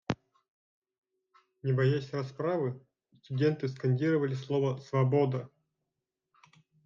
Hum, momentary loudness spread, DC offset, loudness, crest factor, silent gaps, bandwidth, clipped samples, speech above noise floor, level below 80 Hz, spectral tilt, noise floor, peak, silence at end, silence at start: none; 11 LU; under 0.1%; -31 LUFS; 16 dB; 0.48-0.82 s, 0.98-1.02 s; 7 kHz; under 0.1%; 58 dB; -72 dBFS; -8.5 dB/octave; -87 dBFS; -16 dBFS; 1.4 s; 0.1 s